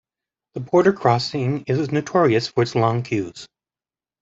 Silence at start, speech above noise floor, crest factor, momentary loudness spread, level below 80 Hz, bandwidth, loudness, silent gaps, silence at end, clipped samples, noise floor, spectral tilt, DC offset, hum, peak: 0.55 s; over 70 dB; 20 dB; 15 LU; -60 dBFS; 8 kHz; -20 LUFS; none; 0.75 s; under 0.1%; under -90 dBFS; -6.5 dB/octave; under 0.1%; none; -2 dBFS